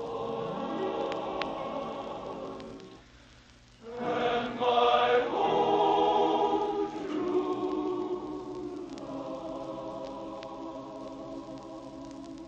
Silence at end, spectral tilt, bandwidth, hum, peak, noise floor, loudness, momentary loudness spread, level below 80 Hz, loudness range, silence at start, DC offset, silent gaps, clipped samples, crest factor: 0 s; -5.5 dB/octave; 8.4 kHz; none; -12 dBFS; -56 dBFS; -31 LUFS; 18 LU; -62 dBFS; 13 LU; 0 s; under 0.1%; none; under 0.1%; 20 dB